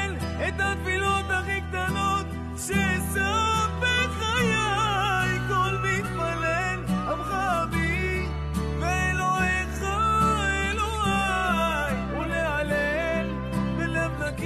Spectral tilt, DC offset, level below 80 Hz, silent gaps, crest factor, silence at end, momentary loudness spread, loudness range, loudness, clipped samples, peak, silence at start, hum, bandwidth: -4.5 dB/octave; under 0.1%; -36 dBFS; none; 14 dB; 0 s; 5 LU; 2 LU; -25 LUFS; under 0.1%; -12 dBFS; 0 s; none; 13 kHz